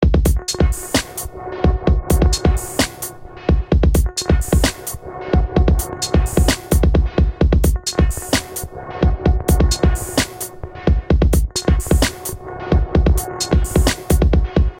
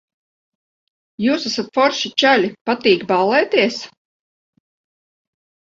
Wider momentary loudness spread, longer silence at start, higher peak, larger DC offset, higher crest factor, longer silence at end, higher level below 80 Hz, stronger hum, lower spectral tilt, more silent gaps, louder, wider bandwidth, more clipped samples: first, 12 LU vs 7 LU; second, 0 s vs 1.2 s; about the same, -2 dBFS vs 0 dBFS; neither; second, 14 dB vs 20 dB; second, 0 s vs 1.8 s; first, -18 dBFS vs -66 dBFS; neither; about the same, -5 dB/octave vs -4 dB/octave; second, none vs 2.61-2.65 s; about the same, -18 LUFS vs -17 LUFS; first, 17 kHz vs 7.8 kHz; neither